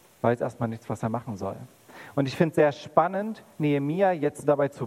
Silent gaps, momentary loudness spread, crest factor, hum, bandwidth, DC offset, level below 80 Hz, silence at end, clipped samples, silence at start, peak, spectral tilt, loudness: none; 12 LU; 22 dB; none; 15.5 kHz; under 0.1%; -68 dBFS; 0 s; under 0.1%; 0.25 s; -6 dBFS; -7.5 dB/octave; -27 LUFS